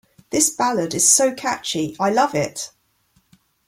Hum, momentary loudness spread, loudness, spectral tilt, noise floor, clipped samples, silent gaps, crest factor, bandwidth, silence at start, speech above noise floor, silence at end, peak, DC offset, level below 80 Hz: none; 12 LU; -18 LUFS; -2.5 dB/octave; -63 dBFS; under 0.1%; none; 20 dB; 16.5 kHz; 0.3 s; 43 dB; 1 s; 0 dBFS; under 0.1%; -60 dBFS